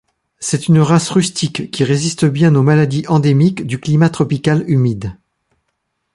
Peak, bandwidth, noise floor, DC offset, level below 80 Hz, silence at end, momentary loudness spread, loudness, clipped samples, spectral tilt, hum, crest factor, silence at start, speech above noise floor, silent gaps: -2 dBFS; 11.5 kHz; -70 dBFS; under 0.1%; -48 dBFS; 1 s; 9 LU; -14 LUFS; under 0.1%; -6 dB/octave; none; 14 dB; 0.4 s; 57 dB; none